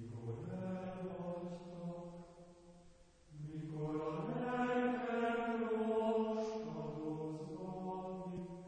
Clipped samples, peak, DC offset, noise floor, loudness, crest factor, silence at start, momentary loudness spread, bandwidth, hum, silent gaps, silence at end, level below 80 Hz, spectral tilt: under 0.1%; -24 dBFS; under 0.1%; -63 dBFS; -41 LUFS; 16 dB; 0 s; 13 LU; 9.4 kHz; none; none; 0 s; -68 dBFS; -7.5 dB/octave